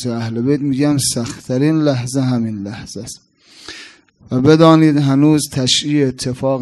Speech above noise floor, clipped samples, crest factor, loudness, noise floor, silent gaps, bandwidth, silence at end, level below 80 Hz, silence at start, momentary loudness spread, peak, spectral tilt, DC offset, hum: 25 dB; under 0.1%; 16 dB; -14 LUFS; -40 dBFS; none; 12.5 kHz; 0 s; -50 dBFS; 0 s; 20 LU; 0 dBFS; -5.5 dB/octave; under 0.1%; none